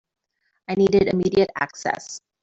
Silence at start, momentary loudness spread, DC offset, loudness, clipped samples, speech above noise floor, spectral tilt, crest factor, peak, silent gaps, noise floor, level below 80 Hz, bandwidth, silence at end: 0.7 s; 14 LU; under 0.1%; -21 LUFS; under 0.1%; 52 dB; -5.5 dB/octave; 18 dB; -4 dBFS; none; -73 dBFS; -52 dBFS; 7.8 kHz; 0.25 s